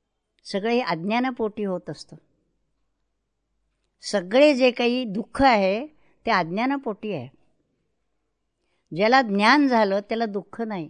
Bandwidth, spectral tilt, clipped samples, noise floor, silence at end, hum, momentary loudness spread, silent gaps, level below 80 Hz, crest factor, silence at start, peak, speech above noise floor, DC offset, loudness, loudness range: 10 kHz; -5.5 dB/octave; under 0.1%; -77 dBFS; 0 s; none; 15 LU; none; -56 dBFS; 20 dB; 0.45 s; -4 dBFS; 55 dB; under 0.1%; -22 LUFS; 8 LU